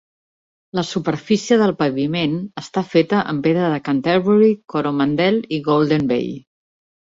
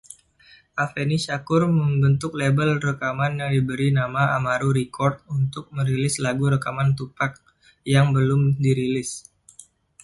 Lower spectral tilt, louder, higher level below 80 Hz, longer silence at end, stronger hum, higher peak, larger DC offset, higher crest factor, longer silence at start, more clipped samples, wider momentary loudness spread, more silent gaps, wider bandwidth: about the same, -6.5 dB/octave vs -6.5 dB/octave; first, -18 LUFS vs -22 LUFS; about the same, -58 dBFS vs -54 dBFS; about the same, 0.8 s vs 0.85 s; neither; first, -2 dBFS vs -6 dBFS; neither; about the same, 16 dB vs 16 dB; about the same, 0.75 s vs 0.75 s; neither; about the same, 10 LU vs 8 LU; neither; second, 7.8 kHz vs 11.5 kHz